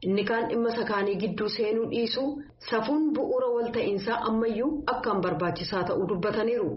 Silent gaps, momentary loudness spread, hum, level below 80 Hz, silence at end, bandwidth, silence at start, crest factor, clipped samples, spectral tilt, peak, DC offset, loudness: none; 3 LU; none; -56 dBFS; 0 s; 6 kHz; 0 s; 14 dB; under 0.1%; -4 dB/octave; -12 dBFS; under 0.1%; -28 LUFS